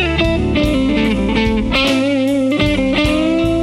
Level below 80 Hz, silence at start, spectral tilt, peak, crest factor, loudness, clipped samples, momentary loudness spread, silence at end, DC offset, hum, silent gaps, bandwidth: -26 dBFS; 0 s; -6 dB/octave; 0 dBFS; 14 dB; -15 LUFS; under 0.1%; 1 LU; 0 s; under 0.1%; none; none; 13.5 kHz